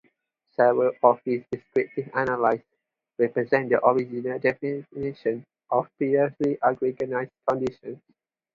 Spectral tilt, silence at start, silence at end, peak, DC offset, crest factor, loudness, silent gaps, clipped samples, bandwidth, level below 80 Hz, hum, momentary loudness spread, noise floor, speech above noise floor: -8.5 dB/octave; 0.6 s; 0.6 s; -2 dBFS; under 0.1%; 22 dB; -25 LUFS; none; under 0.1%; 7.4 kHz; -64 dBFS; none; 11 LU; -72 dBFS; 48 dB